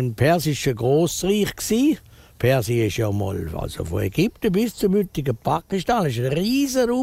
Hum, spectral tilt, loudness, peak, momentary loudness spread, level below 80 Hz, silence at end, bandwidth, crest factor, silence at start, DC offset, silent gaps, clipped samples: none; -5.5 dB/octave; -22 LUFS; -6 dBFS; 6 LU; -44 dBFS; 0 s; 16 kHz; 16 dB; 0 s; under 0.1%; none; under 0.1%